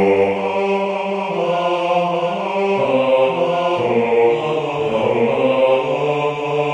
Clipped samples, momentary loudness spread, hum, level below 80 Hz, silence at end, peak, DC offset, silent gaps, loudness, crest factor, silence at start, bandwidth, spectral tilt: under 0.1%; 5 LU; none; -58 dBFS; 0 s; -4 dBFS; under 0.1%; none; -17 LUFS; 12 dB; 0 s; 9.6 kHz; -6.5 dB/octave